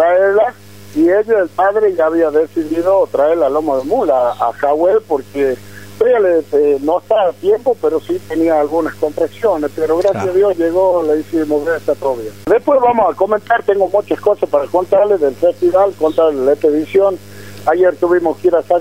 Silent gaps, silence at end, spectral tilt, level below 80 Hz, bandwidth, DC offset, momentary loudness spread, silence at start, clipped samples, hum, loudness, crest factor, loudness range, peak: none; 0 s; -6.5 dB/octave; -56 dBFS; 16 kHz; 0.7%; 5 LU; 0 s; under 0.1%; none; -14 LUFS; 14 dB; 2 LU; 0 dBFS